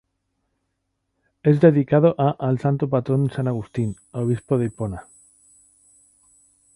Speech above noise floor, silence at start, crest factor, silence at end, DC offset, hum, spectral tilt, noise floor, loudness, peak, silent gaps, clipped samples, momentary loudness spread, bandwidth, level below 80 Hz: 55 dB; 1.45 s; 20 dB; 1.75 s; under 0.1%; none; -9 dB/octave; -75 dBFS; -21 LUFS; -2 dBFS; none; under 0.1%; 12 LU; 11 kHz; -54 dBFS